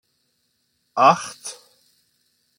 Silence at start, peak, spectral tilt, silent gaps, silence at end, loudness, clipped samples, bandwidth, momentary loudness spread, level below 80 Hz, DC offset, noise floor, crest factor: 0.95 s; -2 dBFS; -3.5 dB/octave; none; 1.05 s; -19 LUFS; under 0.1%; 16.5 kHz; 20 LU; -74 dBFS; under 0.1%; -70 dBFS; 22 dB